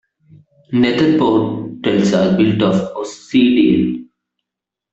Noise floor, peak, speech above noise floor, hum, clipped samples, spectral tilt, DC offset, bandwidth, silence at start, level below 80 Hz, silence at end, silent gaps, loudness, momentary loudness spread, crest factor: -84 dBFS; -2 dBFS; 70 dB; none; under 0.1%; -6.5 dB/octave; under 0.1%; 8 kHz; 0.7 s; -52 dBFS; 0.9 s; none; -15 LUFS; 9 LU; 14 dB